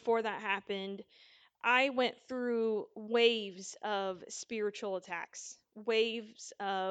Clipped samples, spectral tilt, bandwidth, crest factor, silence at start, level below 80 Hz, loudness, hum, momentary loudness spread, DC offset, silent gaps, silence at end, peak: under 0.1%; -3 dB/octave; 9.2 kHz; 20 dB; 0.05 s; -84 dBFS; -34 LUFS; none; 15 LU; under 0.1%; none; 0 s; -14 dBFS